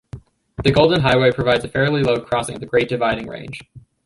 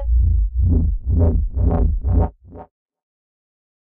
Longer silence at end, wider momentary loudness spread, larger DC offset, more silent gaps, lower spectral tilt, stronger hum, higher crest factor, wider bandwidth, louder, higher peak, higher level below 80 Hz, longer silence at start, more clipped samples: second, 0.25 s vs 1.35 s; first, 17 LU vs 3 LU; neither; neither; second, -6 dB/octave vs -14.5 dB/octave; neither; first, 18 dB vs 12 dB; first, 11.5 kHz vs 1.8 kHz; about the same, -18 LUFS vs -19 LUFS; first, -2 dBFS vs -6 dBFS; second, -42 dBFS vs -20 dBFS; first, 0.15 s vs 0 s; neither